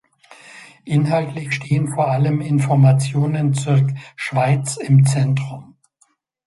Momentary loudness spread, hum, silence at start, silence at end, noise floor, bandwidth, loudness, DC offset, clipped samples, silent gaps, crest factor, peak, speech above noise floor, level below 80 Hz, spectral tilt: 10 LU; none; 0.55 s; 0.85 s; -62 dBFS; 11.5 kHz; -18 LUFS; under 0.1%; under 0.1%; none; 14 dB; -4 dBFS; 45 dB; -56 dBFS; -7 dB/octave